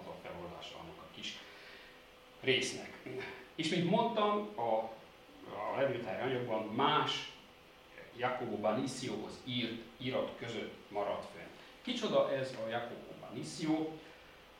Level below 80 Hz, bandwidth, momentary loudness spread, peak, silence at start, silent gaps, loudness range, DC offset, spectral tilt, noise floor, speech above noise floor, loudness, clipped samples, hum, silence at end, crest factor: -72 dBFS; 16.5 kHz; 20 LU; -16 dBFS; 0 s; none; 4 LU; under 0.1%; -4.5 dB/octave; -59 dBFS; 23 dB; -37 LUFS; under 0.1%; none; 0 s; 22 dB